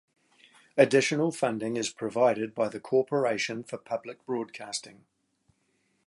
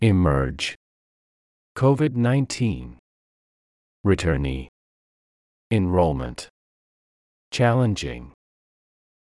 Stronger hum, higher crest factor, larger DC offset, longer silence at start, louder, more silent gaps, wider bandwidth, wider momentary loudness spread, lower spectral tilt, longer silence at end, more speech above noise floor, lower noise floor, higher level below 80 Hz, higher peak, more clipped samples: neither; about the same, 22 dB vs 18 dB; neither; first, 0.75 s vs 0 s; second, -28 LUFS vs -23 LUFS; second, none vs 0.76-1.75 s, 2.99-4.04 s, 4.69-5.70 s, 6.50-7.51 s; about the same, 11.5 kHz vs 11.5 kHz; second, 13 LU vs 18 LU; second, -4.5 dB/octave vs -6.5 dB/octave; about the same, 1.15 s vs 1.1 s; second, 45 dB vs over 69 dB; second, -73 dBFS vs under -90 dBFS; second, -76 dBFS vs -40 dBFS; about the same, -6 dBFS vs -6 dBFS; neither